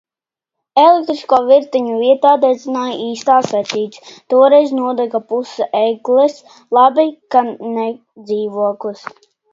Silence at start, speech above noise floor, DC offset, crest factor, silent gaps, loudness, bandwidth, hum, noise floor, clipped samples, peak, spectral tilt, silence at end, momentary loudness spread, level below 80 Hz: 0.75 s; 74 dB; under 0.1%; 14 dB; none; -14 LUFS; 7.6 kHz; none; -88 dBFS; under 0.1%; 0 dBFS; -5 dB/octave; 0.55 s; 11 LU; -68 dBFS